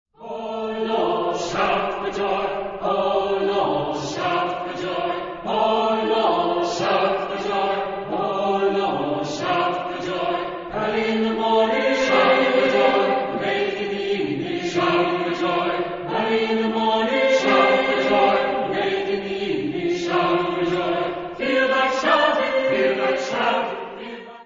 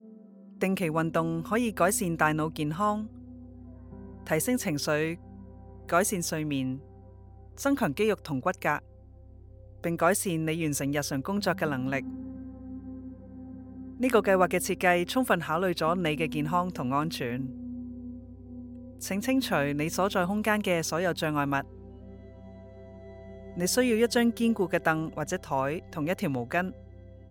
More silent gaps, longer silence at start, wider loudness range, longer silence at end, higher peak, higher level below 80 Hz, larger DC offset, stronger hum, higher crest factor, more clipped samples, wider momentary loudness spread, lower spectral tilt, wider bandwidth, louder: neither; first, 0.2 s vs 0.05 s; about the same, 4 LU vs 5 LU; about the same, 0 s vs 0 s; first, -4 dBFS vs -8 dBFS; about the same, -54 dBFS vs -54 dBFS; neither; neither; about the same, 18 dB vs 22 dB; neither; second, 9 LU vs 21 LU; about the same, -4.5 dB/octave vs -5 dB/octave; second, 7.6 kHz vs 19.5 kHz; first, -21 LUFS vs -28 LUFS